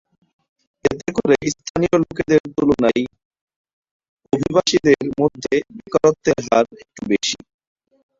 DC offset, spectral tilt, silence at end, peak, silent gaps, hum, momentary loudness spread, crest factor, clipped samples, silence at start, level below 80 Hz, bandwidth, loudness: under 0.1%; -5 dB/octave; 0.85 s; -2 dBFS; 1.70-1.75 s, 2.40-2.44 s, 3.25-3.31 s, 3.41-3.47 s, 3.56-3.64 s, 3.73-3.82 s, 3.91-4.00 s, 4.09-4.17 s; none; 7 LU; 18 dB; under 0.1%; 0.85 s; -50 dBFS; 7.8 kHz; -19 LUFS